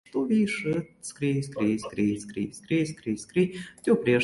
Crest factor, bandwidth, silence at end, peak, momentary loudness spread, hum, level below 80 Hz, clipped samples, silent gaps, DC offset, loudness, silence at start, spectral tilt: 16 dB; 11.5 kHz; 0 s; -10 dBFS; 8 LU; none; -62 dBFS; under 0.1%; none; under 0.1%; -28 LUFS; 0.15 s; -6 dB/octave